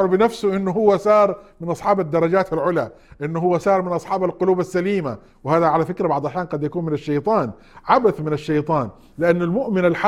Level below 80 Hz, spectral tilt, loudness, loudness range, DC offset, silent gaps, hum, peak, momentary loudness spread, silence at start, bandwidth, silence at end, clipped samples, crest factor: -52 dBFS; -7.5 dB/octave; -20 LUFS; 2 LU; under 0.1%; none; none; -2 dBFS; 9 LU; 0 s; 13 kHz; 0 s; under 0.1%; 18 dB